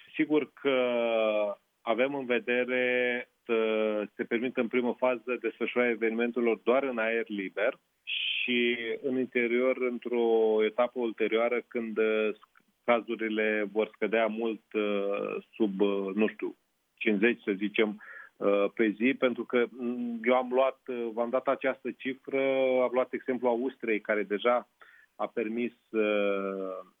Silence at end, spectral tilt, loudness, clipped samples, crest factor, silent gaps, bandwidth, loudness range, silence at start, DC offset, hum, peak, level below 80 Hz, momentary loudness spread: 0.15 s; -7.5 dB/octave; -29 LUFS; under 0.1%; 18 dB; none; 3.9 kHz; 2 LU; 0.15 s; under 0.1%; none; -10 dBFS; -88 dBFS; 7 LU